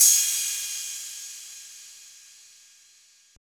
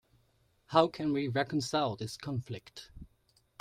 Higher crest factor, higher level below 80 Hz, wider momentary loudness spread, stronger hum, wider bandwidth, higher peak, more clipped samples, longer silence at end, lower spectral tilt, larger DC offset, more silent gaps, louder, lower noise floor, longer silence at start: about the same, 22 dB vs 26 dB; second, -72 dBFS vs -64 dBFS; first, 25 LU vs 19 LU; neither; first, over 20 kHz vs 15.5 kHz; first, -6 dBFS vs -10 dBFS; neither; first, 1.3 s vs 0.55 s; second, 5.5 dB/octave vs -5.5 dB/octave; neither; neither; first, -24 LUFS vs -32 LUFS; second, -57 dBFS vs -71 dBFS; second, 0 s vs 0.7 s